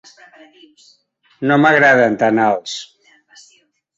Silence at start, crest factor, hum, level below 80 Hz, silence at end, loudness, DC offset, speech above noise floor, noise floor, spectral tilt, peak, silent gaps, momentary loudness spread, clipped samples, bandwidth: 1.4 s; 16 dB; none; -62 dBFS; 1.15 s; -13 LUFS; under 0.1%; 42 dB; -57 dBFS; -5.5 dB/octave; -2 dBFS; none; 15 LU; under 0.1%; 8 kHz